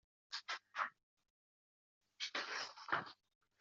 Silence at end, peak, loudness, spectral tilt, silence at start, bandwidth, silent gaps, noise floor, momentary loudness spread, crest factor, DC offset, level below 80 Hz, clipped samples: 0.45 s; -22 dBFS; -44 LUFS; 1 dB/octave; 0.3 s; 7.4 kHz; 1.03-1.17 s, 1.30-2.01 s; under -90 dBFS; 7 LU; 26 dB; under 0.1%; under -90 dBFS; under 0.1%